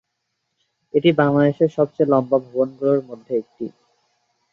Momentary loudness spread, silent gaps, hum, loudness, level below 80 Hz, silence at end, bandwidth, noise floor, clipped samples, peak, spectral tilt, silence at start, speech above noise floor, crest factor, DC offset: 10 LU; none; none; -19 LUFS; -64 dBFS; 0.85 s; 6.8 kHz; -75 dBFS; under 0.1%; -2 dBFS; -9 dB/octave; 0.95 s; 57 dB; 18 dB; under 0.1%